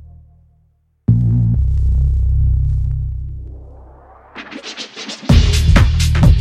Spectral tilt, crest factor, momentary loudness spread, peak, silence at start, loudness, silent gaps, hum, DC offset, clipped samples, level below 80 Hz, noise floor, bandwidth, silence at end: -6 dB/octave; 14 dB; 19 LU; 0 dBFS; 1.1 s; -16 LUFS; none; none; under 0.1%; under 0.1%; -18 dBFS; -57 dBFS; 13 kHz; 0 s